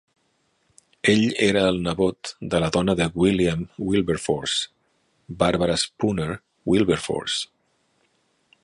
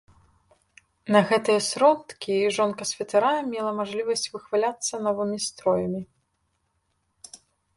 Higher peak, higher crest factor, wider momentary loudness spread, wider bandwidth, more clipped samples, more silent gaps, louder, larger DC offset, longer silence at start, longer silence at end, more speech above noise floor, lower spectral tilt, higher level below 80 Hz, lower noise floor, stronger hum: about the same, -4 dBFS vs -4 dBFS; about the same, 20 dB vs 22 dB; second, 9 LU vs 12 LU; about the same, 11.5 kHz vs 11.5 kHz; neither; neither; about the same, -22 LUFS vs -24 LUFS; neither; about the same, 1.05 s vs 1.05 s; first, 1.2 s vs 0.4 s; about the same, 46 dB vs 49 dB; first, -5 dB/octave vs -3.5 dB/octave; first, -46 dBFS vs -66 dBFS; second, -68 dBFS vs -73 dBFS; neither